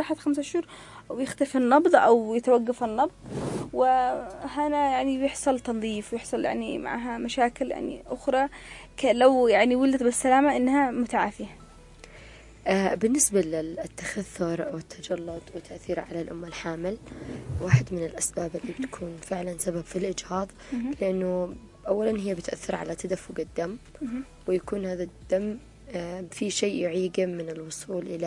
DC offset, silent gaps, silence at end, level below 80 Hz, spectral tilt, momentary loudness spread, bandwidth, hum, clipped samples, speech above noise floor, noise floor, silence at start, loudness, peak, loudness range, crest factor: under 0.1%; none; 0 s; -52 dBFS; -5 dB/octave; 14 LU; 11.5 kHz; none; under 0.1%; 22 dB; -49 dBFS; 0 s; -27 LUFS; -4 dBFS; 9 LU; 22 dB